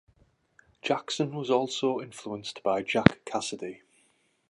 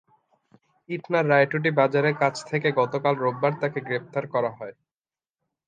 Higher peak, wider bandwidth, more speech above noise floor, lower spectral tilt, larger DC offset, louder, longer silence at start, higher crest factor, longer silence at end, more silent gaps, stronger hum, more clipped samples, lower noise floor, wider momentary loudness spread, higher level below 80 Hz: first, 0 dBFS vs -6 dBFS; first, 11.5 kHz vs 9.6 kHz; second, 40 dB vs over 66 dB; second, -5 dB/octave vs -6.5 dB/octave; neither; second, -29 LUFS vs -24 LUFS; about the same, 0.85 s vs 0.9 s; first, 30 dB vs 20 dB; second, 0.75 s vs 0.95 s; neither; neither; neither; second, -69 dBFS vs under -90 dBFS; first, 14 LU vs 10 LU; first, -56 dBFS vs -74 dBFS